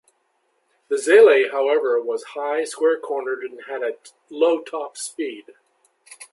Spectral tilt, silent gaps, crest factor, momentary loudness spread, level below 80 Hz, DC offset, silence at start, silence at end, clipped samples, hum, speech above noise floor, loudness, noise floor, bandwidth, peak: -1.5 dB/octave; none; 18 dB; 17 LU; -82 dBFS; under 0.1%; 0.9 s; 0.05 s; under 0.1%; none; 48 dB; -20 LUFS; -68 dBFS; 11.5 kHz; -2 dBFS